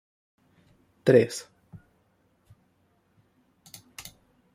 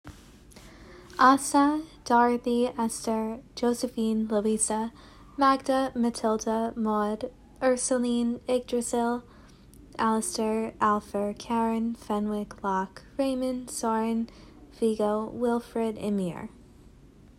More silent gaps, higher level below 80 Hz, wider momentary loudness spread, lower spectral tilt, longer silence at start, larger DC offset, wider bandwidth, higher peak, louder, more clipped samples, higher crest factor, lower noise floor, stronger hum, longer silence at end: neither; second, -70 dBFS vs -56 dBFS; first, 28 LU vs 9 LU; first, -6 dB/octave vs -4.5 dB/octave; first, 1.05 s vs 0.05 s; neither; about the same, 16 kHz vs 15.5 kHz; about the same, -6 dBFS vs -6 dBFS; first, -24 LUFS vs -27 LUFS; neither; about the same, 24 dB vs 22 dB; first, -68 dBFS vs -53 dBFS; neither; first, 3.15 s vs 0.9 s